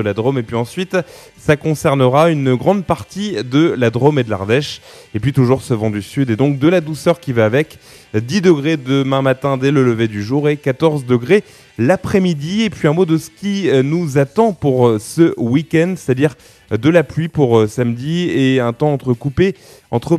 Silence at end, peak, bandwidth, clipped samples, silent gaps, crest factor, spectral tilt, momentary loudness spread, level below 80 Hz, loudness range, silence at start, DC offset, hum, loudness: 0 s; 0 dBFS; 14 kHz; under 0.1%; none; 14 dB; -7 dB/octave; 7 LU; -48 dBFS; 1 LU; 0 s; under 0.1%; none; -15 LUFS